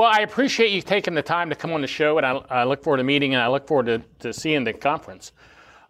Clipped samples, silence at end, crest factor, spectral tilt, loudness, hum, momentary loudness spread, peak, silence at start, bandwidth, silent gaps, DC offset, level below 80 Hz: under 0.1%; 0.6 s; 16 dB; -4.5 dB/octave; -21 LUFS; none; 8 LU; -6 dBFS; 0 s; 14 kHz; none; under 0.1%; -60 dBFS